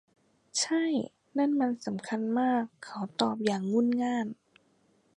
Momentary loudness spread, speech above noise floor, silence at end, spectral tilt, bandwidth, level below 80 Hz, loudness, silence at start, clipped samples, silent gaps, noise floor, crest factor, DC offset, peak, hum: 9 LU; 39 dB; 0.85 s; -4 dB/octave; 11 kHz; -78 dBFS; -30 LUFS; 0.55 s; under 0.1%; none; -68 dBFS; 22 dB; under 0.1%; -10 dBFS; none